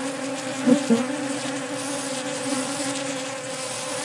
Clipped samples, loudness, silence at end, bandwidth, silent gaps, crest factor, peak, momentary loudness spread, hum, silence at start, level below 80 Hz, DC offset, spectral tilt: under 0.1%; -25 LUFS; 0 s; 11.5 kHz; none; 22 dB; -4 dBFS; 8 LU; none; 0 s; -78 dBFS; under 0.1%; -3 dB/octave